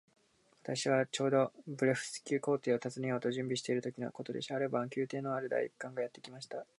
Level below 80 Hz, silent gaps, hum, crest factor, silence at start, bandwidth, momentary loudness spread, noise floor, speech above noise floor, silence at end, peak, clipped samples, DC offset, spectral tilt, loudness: -84 dBFS; none; none; 20 dB; 0.65 s; 11.5 kHz; 10 LU; -64 dBFS; 28 dB; 0.15 s; -16 dBFS; under 0.1%; under 0.1%; -5 dB/octave; -36 LUFS